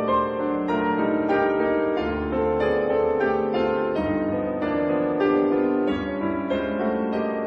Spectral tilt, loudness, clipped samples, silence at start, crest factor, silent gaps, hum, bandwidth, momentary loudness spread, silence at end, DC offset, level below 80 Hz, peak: -8.5 dB/octave; -23 LUFS; under 0.1%; 0 s; 14 dB; none; none; 6 kHz; 4 LU; 0 s; under 0.1%; -46 dBFS; -8 dBFS